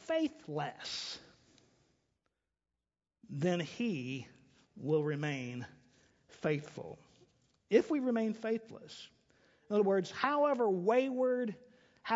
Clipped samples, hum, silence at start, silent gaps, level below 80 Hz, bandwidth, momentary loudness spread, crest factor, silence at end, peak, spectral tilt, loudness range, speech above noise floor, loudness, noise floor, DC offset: under 0.1%; none; 0.05 s; none; -78 dBFS; 7.6 kHz; 19 LU; 22 dB; 0 s; -14 dBFS; -5 dB/octave; 8 LU; over 56 dB; -34 LUFS; under -90 dBFS; under 0.1%